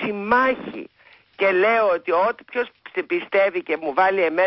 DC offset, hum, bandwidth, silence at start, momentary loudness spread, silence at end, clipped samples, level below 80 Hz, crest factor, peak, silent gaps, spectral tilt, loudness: under 0.1%; none; 5.8 kHz; 0 s; 11 LU; 0 s; under 0.1%; -62 dBFS; 14 dB; -6 dBFS; none; -9 dB/octave; -21 LUFS